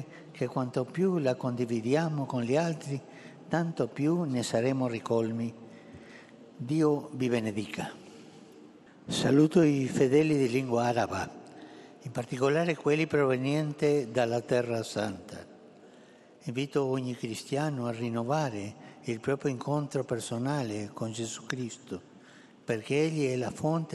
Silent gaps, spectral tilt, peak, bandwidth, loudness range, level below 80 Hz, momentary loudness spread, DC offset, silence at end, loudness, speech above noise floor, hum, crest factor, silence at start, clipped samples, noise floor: none; -6 dB/octave; -10 dBFS; 12.5 kHz; 6 LU; -70 dBFS; 17 LU; under 0.1%; 0 s; -30 LUFS; 26 dB; none; 20 dB; 0 s; under 0.1%; -55 dBFS